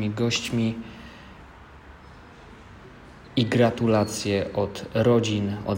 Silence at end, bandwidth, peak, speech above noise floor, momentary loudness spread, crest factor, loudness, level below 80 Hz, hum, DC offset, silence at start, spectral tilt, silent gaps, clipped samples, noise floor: 0 s; 16 kHz; -8 dBFS; 23 dB; 22 LU; 18 dB; -24 LUFS; -52 dBFS; none; under 0.1%; 0 s; -5.5 dB/octave; none; under 0.1%; -46 dBFS